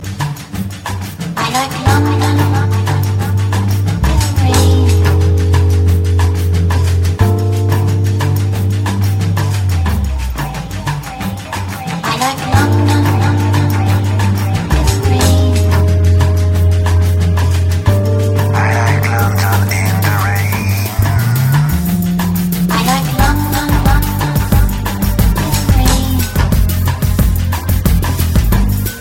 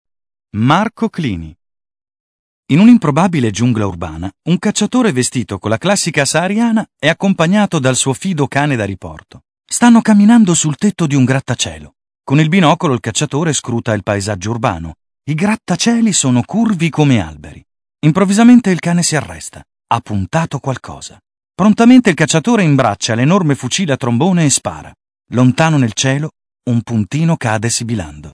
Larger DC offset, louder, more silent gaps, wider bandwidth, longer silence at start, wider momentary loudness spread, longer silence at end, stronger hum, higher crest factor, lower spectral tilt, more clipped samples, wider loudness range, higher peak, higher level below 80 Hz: neither; about the same, -13 LUFS vs -13 LUFS; second, none vs 2.20-2.63 s; first, 17 kHz vs 11 kHz; second, 0 s vs 0.55 s; second, 7 LU vs 14 LU; about the same, 0 s vs 0.05 s; neither; about the same, 12 dB vs 14 dB; about the same, -6 dB/octave vs -5 dB/octave; second, under 0.1% vs 0.2%; about the same, 3 LU vs 3 LU; about the same, 0 dBFS vs 0 dBFS; first, -20 dBFS vs -46 dBFS